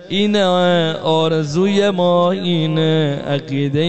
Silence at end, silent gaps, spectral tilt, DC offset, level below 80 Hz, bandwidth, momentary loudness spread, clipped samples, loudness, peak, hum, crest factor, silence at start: 0 s; none; -6.5 dB/octave; 1%; -54 dBFS; 8.6 kHz; 5 LU; under 0.1%; -16 LUFS; -4 dBFS; none; 10 dB; 0 s